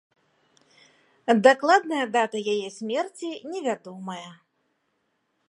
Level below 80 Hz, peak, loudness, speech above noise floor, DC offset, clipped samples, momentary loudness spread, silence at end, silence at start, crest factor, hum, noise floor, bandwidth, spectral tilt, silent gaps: -80 dBFS; -4 dBFS; -24 LUFS; 50 dB; under 0.1%; under 0.1%; 18 LU; 1.15 s; 1.25 s; 24 dB; none; -74 dBFS; 11.5 kHz; -4 dB/octave; none